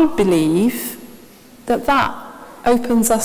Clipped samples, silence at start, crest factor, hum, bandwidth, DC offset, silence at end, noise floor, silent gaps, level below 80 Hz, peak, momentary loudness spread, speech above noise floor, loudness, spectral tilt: under 0.1%; 0 s; 16 dB; none; 16 kHz; under 0.1%; 0 s; -43 dBFS; none; -44 dBFS; -2 dBFS; 19 LU; 27 dB; -17 LUFS; -4.5 dB/octave